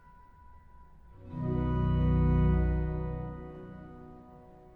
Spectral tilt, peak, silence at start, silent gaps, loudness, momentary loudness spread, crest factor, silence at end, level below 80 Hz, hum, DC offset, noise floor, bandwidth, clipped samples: -11 dB/octave; -16 dBFS; 0.5 s; none; -30 LUFS; 23 LU; 14 dB; 0.2 s; -36 dBFS; none; under 0.1%; -55 dBFS; 3.1 kHz; under 0.1%